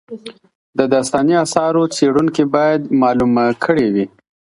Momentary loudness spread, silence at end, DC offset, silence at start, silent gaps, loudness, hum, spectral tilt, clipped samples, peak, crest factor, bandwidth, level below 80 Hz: 7 LU; 0.55 s; under 0.1%; 0.1 s; 0.55-0.73 s; -15 LUFS; none; -5.5 dB/octave; under 0.1%; 0 dBFS; 16 dB; 11.5 kHz; -50 dBFS